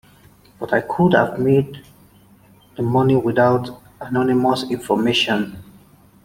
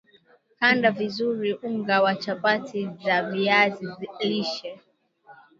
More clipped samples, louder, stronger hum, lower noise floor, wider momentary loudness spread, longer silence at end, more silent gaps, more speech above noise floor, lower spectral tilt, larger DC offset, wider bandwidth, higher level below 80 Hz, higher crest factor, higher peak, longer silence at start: neither; first, -18 LUFS vs -24 LUFS; neither; second, -50 dBFS vs -59 dBFS; about the same, 14 LU vs 12 LU; first, 0.6 s vs 0.25 s; neither; about the same, 32 dB vs 35 dB; about the same, -6.5 dB/octave vs -5.5 dB/octave; neither; first, 16.5 kHz vs 7.6 kHz; first, -52 dBFS vs -74 dBFS; about the same, 18 dB vs 20 dB; about the same, -2 dBFS vs -4 dBFS; about the same, 0.6 s vs 0.6 s